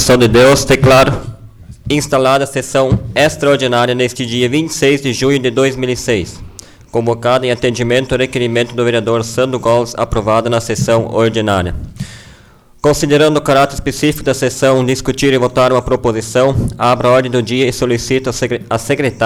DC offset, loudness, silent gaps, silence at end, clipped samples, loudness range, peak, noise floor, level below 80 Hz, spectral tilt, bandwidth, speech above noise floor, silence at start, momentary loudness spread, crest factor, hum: under 0.1%; -13 LUFS; none; 0 s; under 0.1%; 3 LU; -2 dBFS; -43 dBFS; -32 dBFS; -5 dB/octave; 19 kHz; 30 dB; 0 s; 7 LU; 10 dB; none